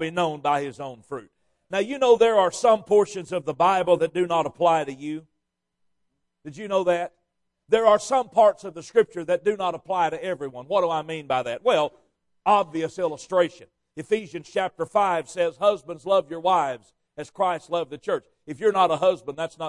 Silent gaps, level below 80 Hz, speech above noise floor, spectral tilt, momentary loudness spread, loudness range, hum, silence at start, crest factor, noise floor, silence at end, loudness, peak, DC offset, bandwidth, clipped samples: none; -66 dBFS; 54 dB; -4.5 dB/octave; 14 LU; 4 LU; none; 0 s; 18 dB; -78 dBFS; 0 s; -23 LUFS; -6 dBFS; under 0.1%; 11.5 kHz; under 0.1%